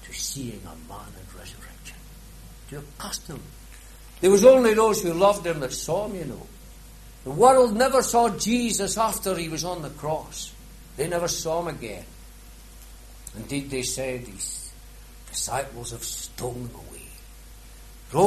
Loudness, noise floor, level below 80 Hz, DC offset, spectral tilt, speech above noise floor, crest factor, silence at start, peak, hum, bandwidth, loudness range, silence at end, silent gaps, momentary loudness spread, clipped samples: -23 LUFS; -45 dBFS; -46 dBFS; under 0.1%; -4 dB/octave; 21 dB; 22 dB; 0 s; -4 dBFS; none; 13.5 kHz; 13 LU; 0 s; none; 24 LU; under 0.1%